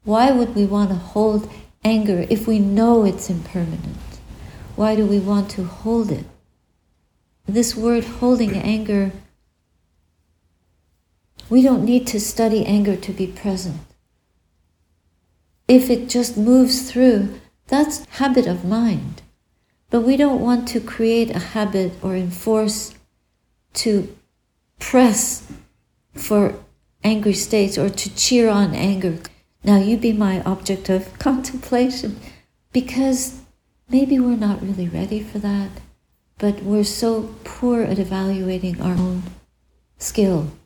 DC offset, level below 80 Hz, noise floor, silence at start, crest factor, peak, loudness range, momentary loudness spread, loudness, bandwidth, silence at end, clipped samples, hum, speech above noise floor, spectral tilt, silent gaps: under 0.1%; -44 dBFS; -68 dBFS; 0.05 s; 20 dB; 0 dBFS; 5 LU; 12 LU; -19 LUFS; over 20 kHz; 0.1 s; under 0.1%; none; 50 dB; -5.5 dB/octave; none